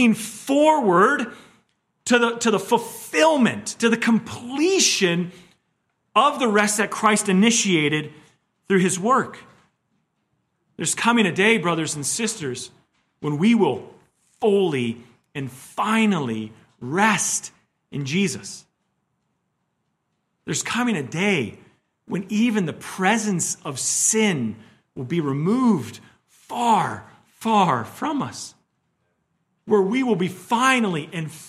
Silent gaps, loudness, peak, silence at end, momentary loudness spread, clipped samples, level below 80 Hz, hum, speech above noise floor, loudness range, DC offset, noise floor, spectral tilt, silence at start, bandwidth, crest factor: none; -21 LUFS; -2 dBFS; 0 s; 15 LU; under 0.1%; -68 dBFS; none; 53 dB; 5 LU; under 0.1%; -74 dBFS; -4 dB/octave; 0 s; 15 kHz; 20 dB